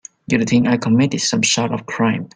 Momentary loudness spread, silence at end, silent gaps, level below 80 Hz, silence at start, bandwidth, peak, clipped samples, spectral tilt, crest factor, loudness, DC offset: 4 LU; 0.1 s; none; -54 dBFS; 0.3 s; 9.6 kHz; -2 dBFS; under 0.1%; -4 dB/octave; 16 dB; -17 LUFS; under 0.1%